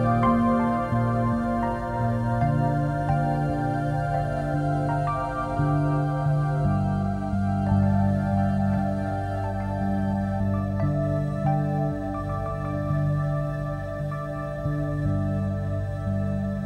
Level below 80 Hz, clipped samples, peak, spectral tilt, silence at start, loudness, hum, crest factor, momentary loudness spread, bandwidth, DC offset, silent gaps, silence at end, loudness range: -40 dBFS; under 0.1%; -10 dBFS; -9.5 dB/octave; 0 s; -25 LUFS; 50 Hz at -50 dBFS; 14 dB; 6 LU; 9.8 kHz; under 0.1%; none; 0 s; 4 LU